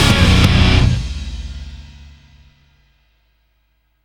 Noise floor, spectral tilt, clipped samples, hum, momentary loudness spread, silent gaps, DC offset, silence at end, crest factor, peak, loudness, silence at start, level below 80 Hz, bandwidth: -62 dBFS; -5 dB/octave; under 0.1%; none; 23 LU; none; under 0.1%; 2 s; 16 dB; 0 dBFS; -13 LUFS; 0 s; -22 dBFS; 16 kHz